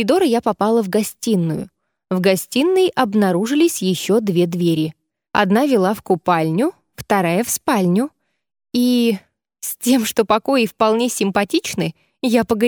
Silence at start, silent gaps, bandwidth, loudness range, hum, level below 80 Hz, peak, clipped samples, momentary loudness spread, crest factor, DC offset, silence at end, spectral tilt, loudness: 0 s; none; over 20 kHz; 2 LU; none; -56 dBFS; 0 dBFS; under 0.1%; 9 LU; 18 dB; under 0.1%; 0 s; -5 dB/octave; -18 LUFS